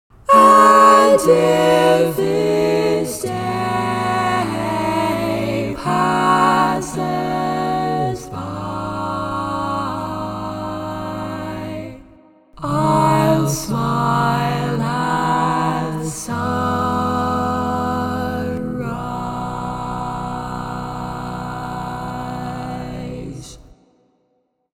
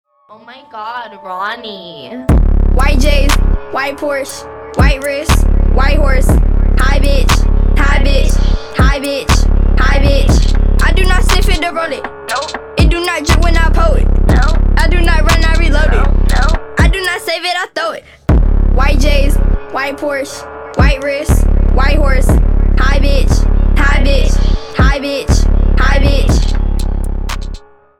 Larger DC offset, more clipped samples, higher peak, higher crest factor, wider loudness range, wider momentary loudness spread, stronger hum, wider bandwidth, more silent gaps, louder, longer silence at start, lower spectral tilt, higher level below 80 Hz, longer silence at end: neither; neither; about the same, 0 dBFS vs 0 dBFS; first, 18 dB vs 10 dB; first, 10 LU vs 2 LU; first, 13 LU vs 9 LU; neither; first, 17.5 kHz vs 13.5 kHz; neither; second, -18 LUFS vs -13 LUFS; about the same, 0.3 s vs 0.3 s; about the same, -5.5 dB/octave vs -5.5 dB/octave; second, -42 dBFS vs -10 dBFS; first, 1.05 s vs 0.4 s